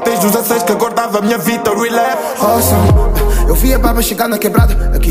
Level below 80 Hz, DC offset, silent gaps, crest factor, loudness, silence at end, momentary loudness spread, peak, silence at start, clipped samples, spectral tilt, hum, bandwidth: -16 dBFS; under 0.1%; none; 12 dB; -13 LUFS; 0 s; 4 LU; 0 dBFS; 0 s; under 0.1%; -5 dB/octave; none; 16 kHz